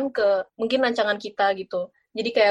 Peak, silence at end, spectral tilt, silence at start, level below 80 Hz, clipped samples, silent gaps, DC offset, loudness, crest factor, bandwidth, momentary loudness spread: -8 dBFS; 0 s; -4.5 dB/octave; 0 s; -68 dBFS; under 0.1%; none; under 0.1%; -24 LUFS; 16 dB; 9 kHz; 9 LU